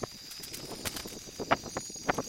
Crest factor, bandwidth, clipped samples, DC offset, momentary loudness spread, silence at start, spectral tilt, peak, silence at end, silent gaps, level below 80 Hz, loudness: 28 dB; 16.5 kHz; under 0.1%; under 0.1%; 9 LU; 0 s; -3 dB/octave; -8 dBFS; 0 s; none; -58 dBFS; -36 LUFS